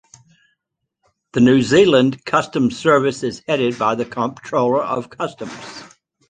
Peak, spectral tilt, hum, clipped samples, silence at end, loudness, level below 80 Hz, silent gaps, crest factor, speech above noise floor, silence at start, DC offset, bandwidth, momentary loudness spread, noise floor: -2 dBFS; -5.5 dB/octave; none; under 0.1%; 0.45 s; -17 LUFS; -56 dBFS; none; 18 dB; 60 dB; 1.35 s; under 0.1%; 9.6 kHz; 16 LU; -77 dBFS